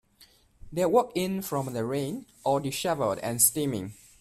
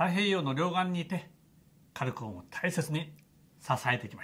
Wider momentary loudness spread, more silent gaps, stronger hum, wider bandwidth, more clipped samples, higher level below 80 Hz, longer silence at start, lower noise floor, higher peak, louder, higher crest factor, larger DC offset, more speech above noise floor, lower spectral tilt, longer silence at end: about the same, 12 LU vs 13 LU; neither; neither; about the same, 16 kHz vs 16 kHz; neither; first, -58 dBFS vs -70 dBFS; first, 0.2 s vs 0 s; about the same, -59 dBFS vs -62 dBFS; first, -6 dBFS vs -14 dBFS; first, -27 LUFS vs -32 LUFS; about the same, 22 dB vs 20 dB; neither; about the same, 32 dB vs 30 dB; second, -4 dB/octave vs -5.5 dB/octave; first, 0.3 s vs 0 s